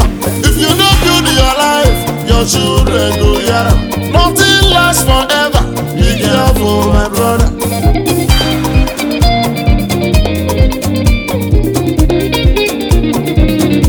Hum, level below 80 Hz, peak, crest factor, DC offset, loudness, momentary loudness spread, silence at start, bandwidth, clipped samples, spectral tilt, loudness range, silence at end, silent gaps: none; -14 dBFS; 0 dBFS; 10 dB; under 0.1%; -10 LUFS; 5 LU; 0 s; over 20 kHz; under 0.1%; -4.5 dB/octave; 3 LU; 0 s; none